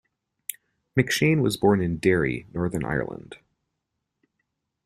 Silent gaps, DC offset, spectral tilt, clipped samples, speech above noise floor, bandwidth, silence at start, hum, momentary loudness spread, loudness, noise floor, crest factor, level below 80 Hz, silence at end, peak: none; under 0.1%; -5.5 dB/octave; under 0.1%; 57 dB; 15.5 kHz; 0.5 s; none; 16 LU; -24 LUFS; -81 dBFS; 22 dB; -52 dBFS; 1.5 s; -4 dBFS